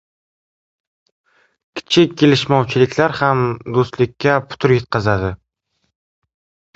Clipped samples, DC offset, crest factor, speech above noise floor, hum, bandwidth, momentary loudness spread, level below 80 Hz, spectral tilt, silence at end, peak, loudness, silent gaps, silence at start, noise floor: under 0.1%; under 0.1%; 18 dB; 55 dB; none; 8 kHz; 8 LU; -46 dBFS; -6 dB/octave; 1.4 s; 0 dBFS; -16 LUFS; none; 1.75 s; -70 dBFS